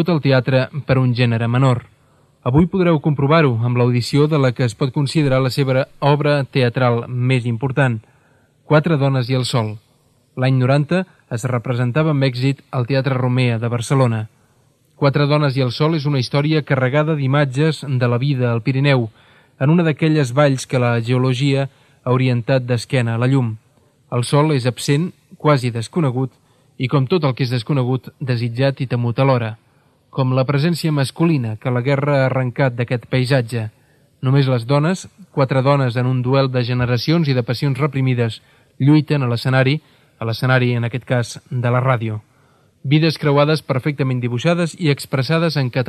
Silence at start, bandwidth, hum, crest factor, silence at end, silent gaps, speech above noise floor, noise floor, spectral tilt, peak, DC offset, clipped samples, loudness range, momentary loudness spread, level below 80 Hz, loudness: 0 s; 12.5 kHz; none; 16 dB; 0 s; none; 40 dB; -57 dBFS; -7 dB/octave; 0 dBFS; under 0.1%; under 0.1%; 3 LU; 7 LU; -52 dBFS; -18 LUFS